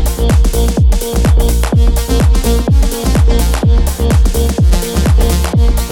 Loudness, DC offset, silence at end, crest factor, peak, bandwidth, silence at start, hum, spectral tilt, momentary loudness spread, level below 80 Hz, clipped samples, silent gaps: -12 LUFS; under 0.1%; 0 s; 10 dB; 0 dBFS; 18 kHz; 0 s; none; -6 dB/octave; 1 LU; -10 dBFS; under 0.1%; none